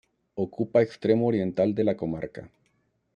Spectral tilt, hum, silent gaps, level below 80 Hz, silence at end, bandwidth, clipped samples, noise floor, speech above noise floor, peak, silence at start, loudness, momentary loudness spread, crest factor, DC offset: -9 dB/octave; none; none; -62 dBFS; 0.7 s; 7.2 kHz; under 0.1%; -71 dBFS; 46 dB; -8 dBFS; 0.35 s; -26 LUFS; 14 LU; 18 dB; under 0.1%